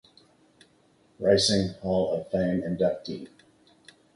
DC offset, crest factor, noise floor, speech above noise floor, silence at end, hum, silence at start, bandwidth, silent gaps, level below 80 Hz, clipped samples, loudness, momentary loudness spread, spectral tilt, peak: under 0.1%; 22 dB; -63 dBFS; 37 dB; 0.9 s; none; 1.2 s; 11.5 kHz; none; -54 dBFS; under 0.1%; -26 LUFS; 16 LU; -5 dB/octave; -8 dBFS